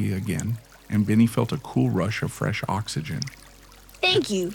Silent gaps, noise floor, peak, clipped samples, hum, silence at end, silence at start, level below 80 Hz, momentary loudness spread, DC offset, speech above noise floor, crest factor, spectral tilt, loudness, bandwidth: none; -49 dBFS; -10 dBFS; under 0.1%; none; 0 s; 0 s; -52 dBFS; 11 LU; under 0.1%; 25 dB; 16 dB; -5.5 dB/octave; -25 LUFS; 19 kHz